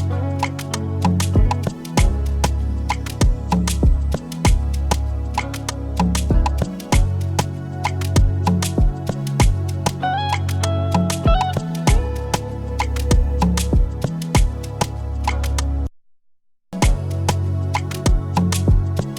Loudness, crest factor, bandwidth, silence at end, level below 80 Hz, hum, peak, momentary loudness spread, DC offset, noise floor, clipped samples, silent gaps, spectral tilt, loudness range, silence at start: -21 LUFS; 16 dB; 17.5 kHz; 0 s; -22 dBFS; none; -2 dBFS; 6 LU; under 0.1%; -56 dBFS; under 0.1%; none; -5.5 dB/octave; 3 LU; 0 s